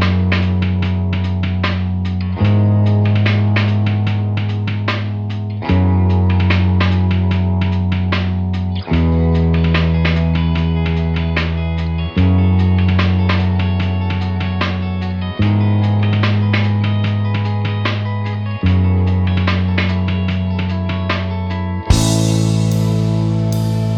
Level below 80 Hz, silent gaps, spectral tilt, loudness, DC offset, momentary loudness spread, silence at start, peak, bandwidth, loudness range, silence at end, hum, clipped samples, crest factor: -28 dBFS; none; -7 dB/octave; -16 LUFS; under 0.1%; 6 LU; 0 s; 0 dBFS; 11 kHz; 1 LU; 0 s; none; under 0.1%; 14 dB